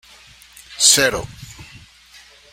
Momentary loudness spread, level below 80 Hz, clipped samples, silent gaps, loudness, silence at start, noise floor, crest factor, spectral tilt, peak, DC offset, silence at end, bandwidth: 26 LU; -46 dBFS; under 0.1%; none; -14 LUFS; 0.7 s; -47 dBFS; 22 dB; -0.5 dB/octave; 0 dBFS; under 0.1%; 0.9 s; 16.5 kHz